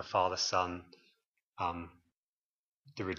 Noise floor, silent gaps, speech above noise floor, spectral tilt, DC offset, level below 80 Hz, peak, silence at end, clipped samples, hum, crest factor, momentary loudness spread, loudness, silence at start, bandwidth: under -90 dBFS; 1.28-1.34 s, 1.43-1.53 s, 2.17-2.82 s; over 55 dB; -3 dB/octave; under 0.1%; -68 dBFS; -16 dBFS; 0 s; under 0.1%; none; 22 dB; 19 LU; -35 LUFS; 0 s; 7.6 kHz